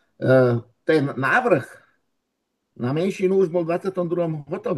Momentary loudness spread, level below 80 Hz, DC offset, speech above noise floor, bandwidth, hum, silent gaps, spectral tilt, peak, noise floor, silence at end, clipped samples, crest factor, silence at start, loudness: 9 LU; -68 dBFS; under 0.1%; 56 dB; 12.5 kHz; none; none; -7.5 dB/octave; -4 dBFS; -77 dBFS; 0 s; under 0.1%; 18 dB; 0.2 s; -21 LUFS